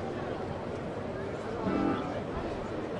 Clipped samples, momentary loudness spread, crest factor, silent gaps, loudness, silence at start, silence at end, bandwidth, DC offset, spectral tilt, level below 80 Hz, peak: under 0.1%; 7 LU; 16 dB; none; -35 LUFS; 0 s; 0 s; 11 kHz; under 0.1%; -7.5 dB/octave; -52 dBFS; -18 dBFS